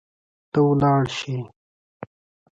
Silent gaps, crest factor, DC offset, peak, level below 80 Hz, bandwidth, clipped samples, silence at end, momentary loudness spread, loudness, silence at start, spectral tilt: 1.56-2.00 s; 16 dB; under 0.1%; -8 dBFS; -54 dBFS; 7.8 kHz; under 0.1%; 0.5 s; 24 LU; -21 LUFS; 0.55 s; -7 dB/octave